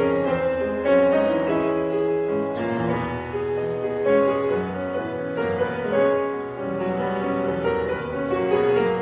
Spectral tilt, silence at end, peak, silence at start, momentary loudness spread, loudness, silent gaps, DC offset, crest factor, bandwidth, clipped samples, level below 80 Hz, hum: -10.5 dB/octave; 0 s; -8 dBFS; 0 s; 8 LU; -23 LUFS; none; under 0.1%; 16 dB; 4 kHz; under 0.1%; -48 dBFS; none